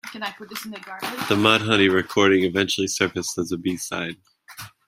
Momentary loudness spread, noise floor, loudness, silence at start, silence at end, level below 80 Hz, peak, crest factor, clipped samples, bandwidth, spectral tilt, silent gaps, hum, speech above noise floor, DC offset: 16 LU; -43 dBFS; -21 LUFS; 0.05 s; 0.2 s; -62 dBFS; -2 dBFS; 22 dB; under 0.1%; 16 kHz; -3.5 dB/octave; none; none; 20 dB; under 0.1%